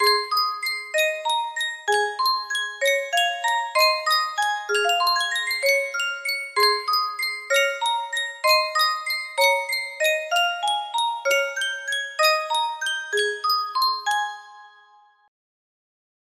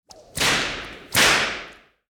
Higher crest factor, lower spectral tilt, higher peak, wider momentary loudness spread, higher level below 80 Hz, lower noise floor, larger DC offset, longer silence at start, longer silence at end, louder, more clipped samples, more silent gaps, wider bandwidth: about the same, 18 dB vs 18 dB; second, 2.5 dB/octave vs -1 dB/octave; about the same, -6 dBFS vs -6 dBFS; second, 7 LU vs 17 LU; second, -76 dBFS vs -48 dBFS; first, -55 dBFS vs -42 dBFS; neither; second, 0 s vs 0.35 s; first, 1.55 s vs 0.4 s; second, -22 LUFS vs -19 LUFS; neither; neither; second, 16 kHz vs 19.5 kHz